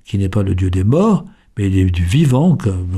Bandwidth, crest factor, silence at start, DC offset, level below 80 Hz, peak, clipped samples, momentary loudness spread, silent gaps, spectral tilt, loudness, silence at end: 12 kHz; 12 dB; 0.1 s; under 0.1%; -34 dBFS; -2 dBFS; under 0.1%; 6 LU; none; -8 dB/octave; -15 LUFS; 0 s